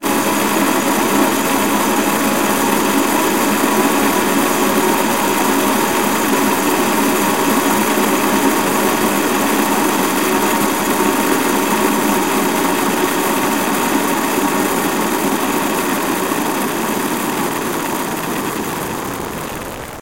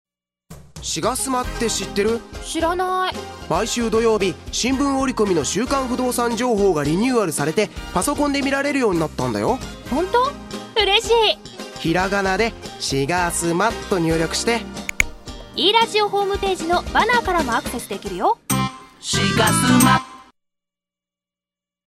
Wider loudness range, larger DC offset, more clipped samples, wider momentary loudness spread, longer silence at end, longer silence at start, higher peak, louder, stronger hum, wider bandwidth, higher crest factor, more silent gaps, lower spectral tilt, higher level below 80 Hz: about the same, 4 LU vs 2 LU; first, 1% vs under 0.1%; neither; second, 5 LU vs 10 LU; second, 0 s vs 1.7 s; second, 0 s vs 0.5 s; about the same, 0 dBFS vs -2 dBFS; first, -15 LUFS vs -20 LUFS; neither; about the same, 16 kHz vs 16 kHz; about the same, 14 dB vs 18 dB; neither; about the same, -3 dB/octave vs -3.5 dB/octave; second, -46 dBFS vs -38 dBFS